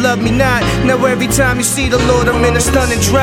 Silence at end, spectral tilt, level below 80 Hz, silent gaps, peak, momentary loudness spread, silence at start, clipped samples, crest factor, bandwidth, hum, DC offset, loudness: 0 s; -4.5 dB/octave; -24 dBFS; none; 0 dBFS; 1 LU; 0 s; under 0.1%; 12 dB; 17 kHz; none; under 0.1%; -12 LUFS